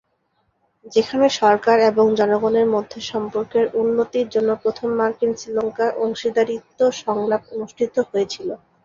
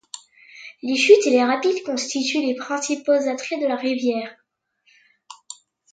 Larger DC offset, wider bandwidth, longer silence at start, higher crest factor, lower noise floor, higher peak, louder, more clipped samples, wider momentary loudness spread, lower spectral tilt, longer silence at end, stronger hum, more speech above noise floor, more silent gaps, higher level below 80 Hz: neither; second, 7.6 kHz vs 9.2 kHz; first, 0.85 s vs 0.15 s; about the same, 18 dB vs 20 dB; about the same, -68 dBFS vs -66 dBFS; about the same, -2 dBFS vs -2 dBFS; about the same, -20 LUFS vs -20 LUFS; neither; second, 9 LU vs 25 LU; first, -4.5 dB/octave vs -2 dB/octave; about the same, 0.3 s vs 0.4 s; neither; about the same, 48 dB vs 46 dB; neither; first, -60 dBFS vs -78 dBFS